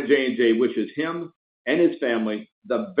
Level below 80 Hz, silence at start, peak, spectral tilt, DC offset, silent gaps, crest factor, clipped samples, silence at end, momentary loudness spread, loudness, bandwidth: -74 dBFS; 0 s; -6 dBFS; -10 dB/octave; under 0.1%; 1.36-1.65 s, 2.52-2.62 s; 16 dB; under 0.1%; 0 s; 13 LU; -23 LUFS; 5 kHz